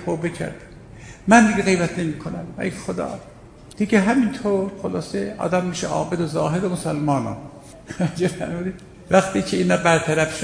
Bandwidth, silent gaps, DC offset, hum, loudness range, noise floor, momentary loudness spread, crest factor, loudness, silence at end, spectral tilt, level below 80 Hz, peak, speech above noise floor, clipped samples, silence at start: 10.5 kHz; none; under 0.1%; none; 3 LU; -40 dBFS; 14 LU; 20 dB; -21 LUFS; 0 s; -5.5 dB/octave; -48 dBFS; -2 dBFS; 20 dB; under 0.1%; 0 s